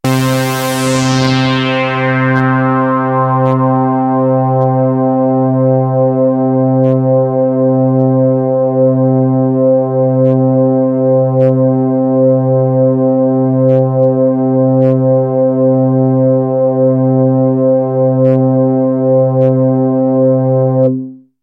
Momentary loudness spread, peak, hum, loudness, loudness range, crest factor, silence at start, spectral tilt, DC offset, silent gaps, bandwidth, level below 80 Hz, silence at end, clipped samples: 2 LU; 0 dBFS; none; -11 LUFS; 1 LU; 10 dB; 0.05 s; -7.5 dB/octave; under 0.1%; none; 16 kHz; -54 dBFS; 0.25 s; under 0.1%